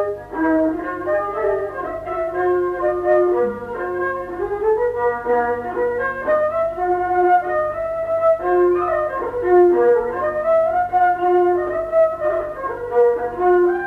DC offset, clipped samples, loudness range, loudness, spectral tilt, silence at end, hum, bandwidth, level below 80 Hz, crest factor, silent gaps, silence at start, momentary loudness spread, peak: under 0.1%; under 0.1%; 4 LU; -19 LUFS; -8 dB/octave; 0 s; 50 Hz at -50 dBFS; 4 kHz; -48 dBFS; 14 dB; none; 0 s; 8 LU; -4 dBFS